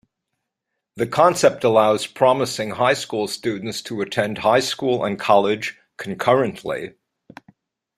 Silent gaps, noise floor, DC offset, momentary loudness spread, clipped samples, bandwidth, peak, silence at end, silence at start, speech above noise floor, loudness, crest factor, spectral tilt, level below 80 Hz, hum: none; -80 dBFS; under 0.1%; 12 LU; under 0.1%; 15.5 kHz; -2 dBFS; 1.1 s; 0.95 s; 61 dB; -20 LUFS; 18 dB; -4.5 dB/octave; -62 dBFS; none